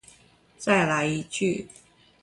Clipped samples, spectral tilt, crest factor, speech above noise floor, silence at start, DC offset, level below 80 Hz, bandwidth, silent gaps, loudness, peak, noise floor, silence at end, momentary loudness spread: under 0.1%; -5 dB/octave; 20 dB; 33 dB; 0.6 s; under 0.1%; -60 dBFS; 11.5 kHz; none; -25 LUFS; -8 dBFS; -57 dBFS; 0.55 s; 12 LU